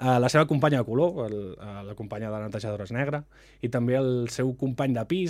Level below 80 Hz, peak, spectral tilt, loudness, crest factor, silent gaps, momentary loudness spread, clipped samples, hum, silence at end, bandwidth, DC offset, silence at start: -58 dBFS; -6 dBFS; -6.5 dB/octave; -27 LUFS; 20 dB; none; 14 LU; under 0.1%; none; 0 s; 14 kHz; under 0.1%; 0 s